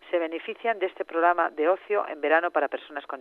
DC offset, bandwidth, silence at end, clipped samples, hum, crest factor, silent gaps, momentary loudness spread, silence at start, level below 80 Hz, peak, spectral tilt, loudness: under 0.1%; 4.3 kHz; 0 s; under 0.1%; none; 18 dB; none; 8 LU; 0.05 s; -80 dBFS; -8 dBFS; -5.5 dB/octave; -26 LUFS